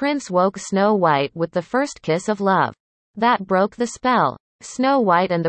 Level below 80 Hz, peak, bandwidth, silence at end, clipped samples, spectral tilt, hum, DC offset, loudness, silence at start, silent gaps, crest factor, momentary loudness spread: -60 dBFS; -4 dBFS; 8.8 kHz; 0 s; under 0.1%; -5.5 dB/octave; none; under 0.1%; -20 LUFS; 0 s; 2.80-3.14 s, 4.40-4.59 s; 16 dB; 6 LU